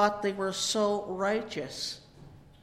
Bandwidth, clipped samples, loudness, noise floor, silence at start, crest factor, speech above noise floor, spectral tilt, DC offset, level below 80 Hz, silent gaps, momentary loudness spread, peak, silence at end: 16 kHz; under 0.1%; -31 LUFS; -52 dBFS; 0 s; 20 dB; 22 dB; -3 dB/octave; under 0.1%; -62 dBFS; none; 9 LU; -12 dBFS; 0.15 s